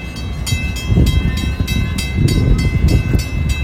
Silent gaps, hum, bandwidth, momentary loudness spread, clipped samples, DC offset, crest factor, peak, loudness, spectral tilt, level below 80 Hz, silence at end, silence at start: none; none; 16 kHz; 5 LU; under 0.1%; under 0.1%; 14 dB; 0 dBFS; -17 LUFS; -5.5 dB/octave; -20 dBFS; 0 s; 0 s